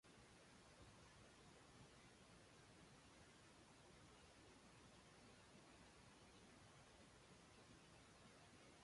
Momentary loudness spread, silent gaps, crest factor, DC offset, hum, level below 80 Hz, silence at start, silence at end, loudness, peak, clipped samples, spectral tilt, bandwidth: 1 LU; none; 14 dB; under 0.1%; none; -80 dBFS; 0.05 s; 0 s; -67 LUFS; -54 dBFS; under 0.1%; -3.5 dB/octave; 11.5 kHz